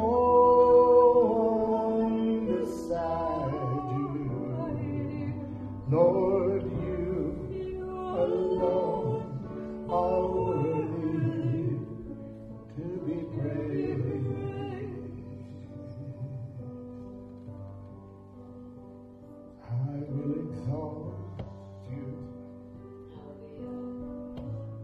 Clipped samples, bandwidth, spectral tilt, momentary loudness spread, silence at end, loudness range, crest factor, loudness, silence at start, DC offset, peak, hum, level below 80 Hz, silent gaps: under 0.1%; 7.4 kHz; -10 dB/octave; 23 LU; 0 s; 14 LU; 18 dB; -29 LUFS; 0 s; under 0.1%; -10 dBFS; none; -52 dBFS; none